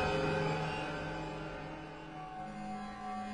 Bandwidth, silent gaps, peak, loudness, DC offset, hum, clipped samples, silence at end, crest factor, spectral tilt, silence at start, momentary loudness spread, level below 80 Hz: 11 kHz; none; -22 dBFS; -39 LUFS; under 0.1%; none; under 0.1%; 0 s; 16 dB; -6 dB/octave; 0 s; 12 LU; -56 dBFS